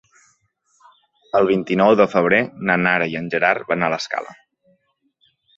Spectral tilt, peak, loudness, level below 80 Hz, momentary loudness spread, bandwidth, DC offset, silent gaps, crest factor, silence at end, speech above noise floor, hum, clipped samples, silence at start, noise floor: -6 dB/octave; -2 dBFS; -18 LUFS; -60 dBFS; 9 LU; 7.8 kHz; under 0.1%; none; 20 dB; 1.25 s; 48 dB; none; under 0.1%; 1.35 s; -66 dBFS